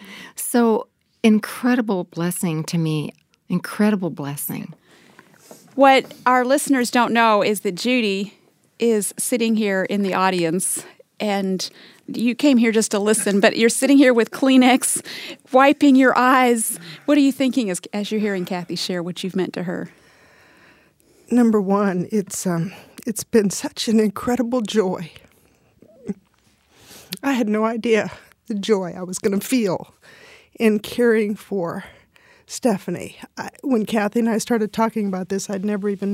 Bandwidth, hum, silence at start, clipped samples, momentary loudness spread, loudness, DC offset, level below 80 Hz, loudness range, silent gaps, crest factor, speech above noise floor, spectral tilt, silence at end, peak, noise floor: 16 kHz; none; 0 s; under 0.1%; 15 LU; -19 LUFS; under 0.1%; -64 dBFS; 8 LU; none; 20 dB; 41 dB; -4.5 dB/octave; 0 s; 0 dBFS; -60 dBFS